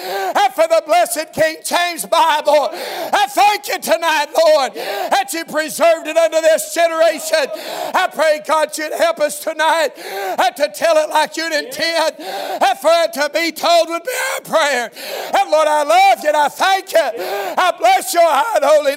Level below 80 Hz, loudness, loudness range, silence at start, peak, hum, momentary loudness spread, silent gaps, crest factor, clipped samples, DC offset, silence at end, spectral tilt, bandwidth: -68 dBFS; -15 LUFS; 2 LU; 0 s; 0 dBFS; none; 7 LU; none; 16 dB; under 0.1%; under 0.1%; 0 s; -1 dB/octave; 16.5 kHz